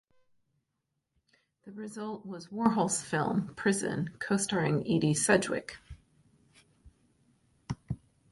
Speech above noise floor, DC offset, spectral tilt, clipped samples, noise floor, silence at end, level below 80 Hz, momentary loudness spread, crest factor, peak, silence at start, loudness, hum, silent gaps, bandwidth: 53 dB; under 0.1%; -4.5 dB/octave; under 0.1%; -83 dBFS; 0.35 s; -60 dBFS; 16 LU; 22 dB; -10 dBFS; 1.65 s; -30 LUFS; none; none; 11.5 kHz